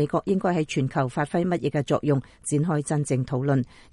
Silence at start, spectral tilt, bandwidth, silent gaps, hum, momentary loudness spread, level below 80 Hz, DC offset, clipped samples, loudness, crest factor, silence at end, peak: 0 s; -6.5 dB/octave; 11.5 kHz; none; none; 2 LU; -56 dBFS; under 0.1%; under 0.1%; -25 LUFS; 16 dB; 0.25 s; -8 dBFS